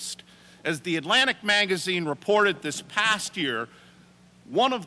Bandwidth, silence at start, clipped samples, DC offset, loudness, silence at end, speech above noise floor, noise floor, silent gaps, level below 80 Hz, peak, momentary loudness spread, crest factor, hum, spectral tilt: 11 kHz; 0 s; under 0.1%; under 0.1%; -24 LUFS; 0 s; 30 dB; -55 dBFS; none; -70 dBFS; -10 dBFS; 12 LU; 16 dB; none; -3 dB/octave